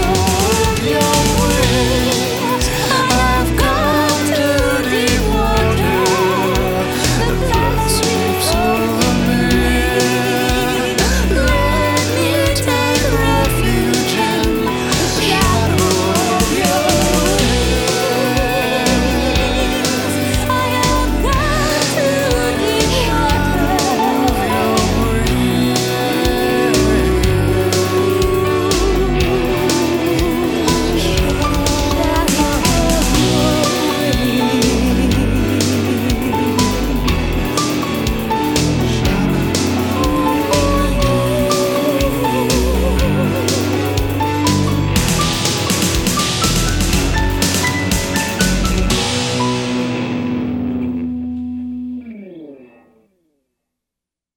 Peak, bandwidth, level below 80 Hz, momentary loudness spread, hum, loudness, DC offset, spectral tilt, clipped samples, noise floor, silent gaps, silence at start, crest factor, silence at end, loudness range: 0 dBFS; over 20 kHz; -24 dBFS; 3 LU; none; -15 LUFS; under 0.1%; -4.5 dB/octave; under 0.1%; -85 dBFS; none; 0 s; 14 dB; 1.7 s; 2 LU